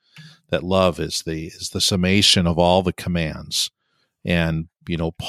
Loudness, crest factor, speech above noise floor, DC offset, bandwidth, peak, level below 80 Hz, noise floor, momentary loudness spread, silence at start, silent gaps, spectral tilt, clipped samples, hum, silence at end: -20 LUFS; 20 dB; 41 dB; under 0.1%; 14.5 kHz; -2 dBFS; -42 dBFS; -61 dBFS; 14 LU; 0.15 s; none; -4 dB/octave; under 0.1%; none; 0 s